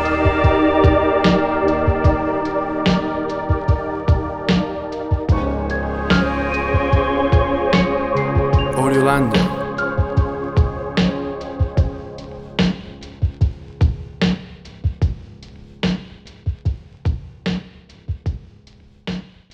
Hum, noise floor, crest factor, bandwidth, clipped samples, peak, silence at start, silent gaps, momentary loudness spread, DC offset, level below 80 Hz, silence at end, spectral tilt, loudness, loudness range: none; -47 dBFS; 16 dB; 12 kHz; under 0.1%; -2 dBFS; 0 s; none; 13 LU; under 0.1%; -28 dBFS; 0.3 s; -7.5 dB/octave; -19 LUFS; 9 LU